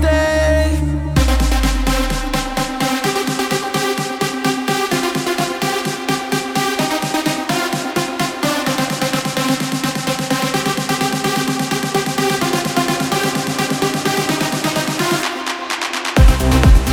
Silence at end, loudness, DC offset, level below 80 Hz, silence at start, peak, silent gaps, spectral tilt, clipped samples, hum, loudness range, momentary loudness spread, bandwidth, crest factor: 0 s; -17 LUFS; under 0.1%; -22 dBFS; 0 s; 0 dBFS; none; -4 dB/octave; under 0.1%; none; 1 LU; 5 LU; 20 kHz; 16 dB